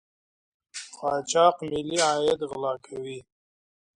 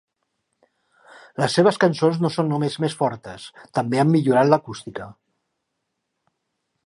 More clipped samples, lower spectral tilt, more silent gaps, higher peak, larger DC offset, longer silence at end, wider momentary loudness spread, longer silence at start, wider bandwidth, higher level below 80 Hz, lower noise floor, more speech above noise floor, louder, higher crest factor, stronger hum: neither; second, -3 dB/octave vs -6.5 dB/octave; neither; second, -6 dBFS vs -2 dBFS; neither; second, 0.75 s vs 1.75 s; about the same, 18 LU vs 19 LU; second, 0.75 s vs 1.4 s; about the same, 11 kHz vs 11.5 kHz; about the same, -64 dBFS vs -64 dBFS; first, under -90 dBFS vs -78 dBFS; first, over 65 dB vs 57 dB; second, -25 LUFS vs -20 LUFS; about the same, 20 dB vs 20 dB; neither